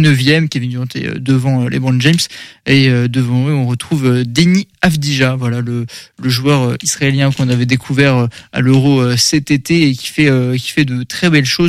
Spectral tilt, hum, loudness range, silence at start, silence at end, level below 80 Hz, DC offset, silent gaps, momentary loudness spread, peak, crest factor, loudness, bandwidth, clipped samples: -5 dB/octave; none; 2 LU; 0 s; 0 s; -44 dBFS; under 0.1%; none; 8 LU; 0 dBFS; 12 dB; -13 LUFS; 15 kHz; under 0.1%